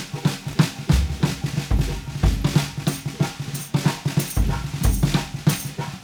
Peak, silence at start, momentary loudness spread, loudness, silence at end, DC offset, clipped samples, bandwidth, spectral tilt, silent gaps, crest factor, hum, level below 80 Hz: -4 dBFS; 0 s; 6 LU; -23 LUFS; 0 s; under 0.1%; under 0.1%; over 20 kHz; -5.5 dB/octave; none; 18 dB; none; -28 dBFS